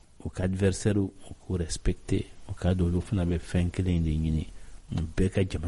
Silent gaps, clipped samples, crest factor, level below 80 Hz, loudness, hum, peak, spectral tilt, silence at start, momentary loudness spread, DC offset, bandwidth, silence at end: none; under 0.1%; 16 dB; -38 dBFS; -29 LUFS; none; -12 dBFS; -7 dB/octave; 0.2 s; 8 LU; under 0.1%; 11.5 kHz; 0 s